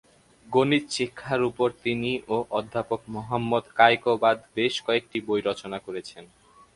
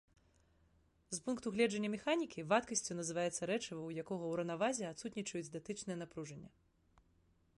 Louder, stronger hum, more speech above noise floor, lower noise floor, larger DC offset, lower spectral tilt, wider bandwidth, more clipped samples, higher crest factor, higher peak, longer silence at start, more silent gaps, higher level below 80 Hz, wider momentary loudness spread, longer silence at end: first, -25 LUFS vs -40 LUFS; neither; second, 18 dB vs 34 dB; second, -44 dBFS vs -74 dBFS; neither; about the same, -5 dB/octave vs -4 dB/octave; about the same, 11.5 kHz vs 11.5 kHz; neither; about the same, 24 dB vs 20 dB; first, -2 dBFS vs -20 dBFS; second, 0.45 s vs 1.1 s; neither; first, -62 dBFS vs -74 dBFS; about the same, 12 LU vs 10 LU; second, 0.5 s vs 1.1 s